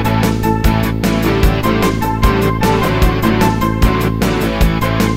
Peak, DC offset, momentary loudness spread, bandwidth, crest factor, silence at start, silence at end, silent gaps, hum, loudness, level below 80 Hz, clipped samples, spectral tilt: 0 dBFS; under 0.1%; 2 LU; 16.5 kHz; 12 dB; 0 s; 0 s; none; none; -14 LUFS; -20 dBFS; under 0.1%; -6 dB/octave